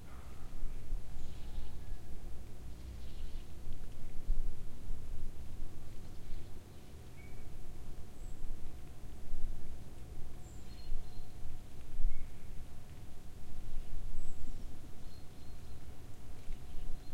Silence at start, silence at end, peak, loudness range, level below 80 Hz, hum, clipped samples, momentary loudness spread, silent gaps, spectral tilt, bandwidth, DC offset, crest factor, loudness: 0 s; 0 s; -16 dBFS; 3 LU; -40 dBFS; none; under 0.1%; 6 LU; none; -6 dB/octave; 4.5 kHz; under 0.1%; 16 dB; -50 LUFS